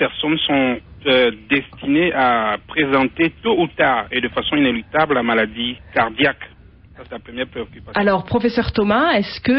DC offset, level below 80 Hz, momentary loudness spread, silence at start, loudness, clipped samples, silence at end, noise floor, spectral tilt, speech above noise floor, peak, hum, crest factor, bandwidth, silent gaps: under 0.1%; -42 dBFS; 11 LU; 0 s; -18 LUFS; under 0.1%; 0 s; -44 dBFS; -8.5 dB/octave; 26 dB; -2 dBFS; none; 16 dB; 6 kHz; none